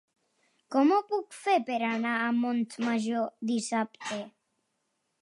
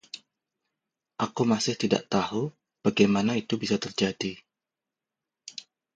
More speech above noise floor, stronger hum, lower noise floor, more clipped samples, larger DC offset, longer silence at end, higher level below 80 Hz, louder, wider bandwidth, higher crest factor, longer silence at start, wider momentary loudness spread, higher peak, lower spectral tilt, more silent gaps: second, 50 dB vs 63 dB; neither; second, -79 dBFS vs -89 dBFS; neither; neither; first, 0.9 s vs 0.35 s; second, -86 dBFS vs -64 dBFS; about the same, -29 LUFS vs -27 LUFS; first, 11.5 kHz vs 9 kHz; second, 18 dB vs 24 dB; first, 0.7 s vs 0.15 s; second, 10 LU vs 21 LU; second, -12 dBFS vs -6 dBFS; about the same, -4.5 dB/octave vs -5 dB/octave; neither